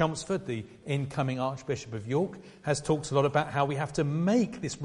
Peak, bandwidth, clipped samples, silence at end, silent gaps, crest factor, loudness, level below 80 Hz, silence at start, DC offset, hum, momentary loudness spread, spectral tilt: -10 dBFS; 11.5 kHz; under 0.1%; 0 s; none; 18 dB; -30 LUFS; -58 dBFS; 0 s; under 0.1%; none; 9 LU; -6 dB/octave